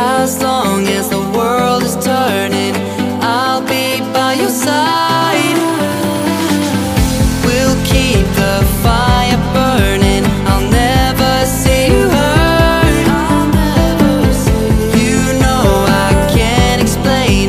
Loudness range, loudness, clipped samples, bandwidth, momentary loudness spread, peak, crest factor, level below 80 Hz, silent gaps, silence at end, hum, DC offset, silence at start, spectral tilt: 3 LU; -12 LUFS; under 0.1%; 15.5 kHz; 4 LU; 0 dBFS; 12 dB; -20 dBFS; none; 0 s; none; under 0.1%; 0 s; -5 dB/octave